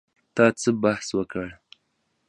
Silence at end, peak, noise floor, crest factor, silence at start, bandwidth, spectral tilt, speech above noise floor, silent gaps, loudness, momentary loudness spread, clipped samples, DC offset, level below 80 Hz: 0.75 s; -4 dBFS; -73 dBFS; 22 dB; 0.35 s; 11 kHz; -5 dB/octave; 50 dB; none; -24 LUFS; 13 LU; under 0.1%; under 0.1%; -58 dBFS